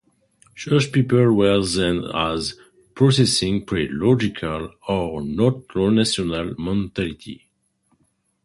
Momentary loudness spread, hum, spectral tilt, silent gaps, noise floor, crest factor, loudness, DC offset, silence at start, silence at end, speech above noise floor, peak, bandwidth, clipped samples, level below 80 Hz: 11 LU; none; -5.5 dB/octave; none; -66 dBFS; 18 dB; -20 LUFS; under 0.1%; 0.55 s; 1.1 s; 46 dB; -4 dBFS; 11.5 kHz; under 0.1%; -44 dBFS